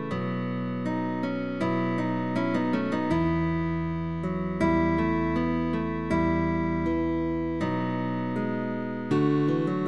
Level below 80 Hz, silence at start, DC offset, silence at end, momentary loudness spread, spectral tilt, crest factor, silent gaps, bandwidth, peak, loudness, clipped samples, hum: -46 dBFS; 0 s; 0.5%; 0 s; 6 LU; -8.5 dB/octave; 14 dB; none; 8.6 kHz; -12 dBFS; -27 LUFS; under 0.1%; none